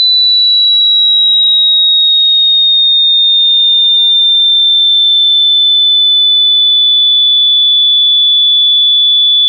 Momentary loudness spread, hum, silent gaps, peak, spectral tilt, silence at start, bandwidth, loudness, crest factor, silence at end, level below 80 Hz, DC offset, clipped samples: 0 LU; none; none; -4 dBFS; 1.5 dB/octave; 0 s; 4.3 kHz; -4 LUFS; 4 dB; 0 s; -76 dBFS; under 0.1%; under 0.1%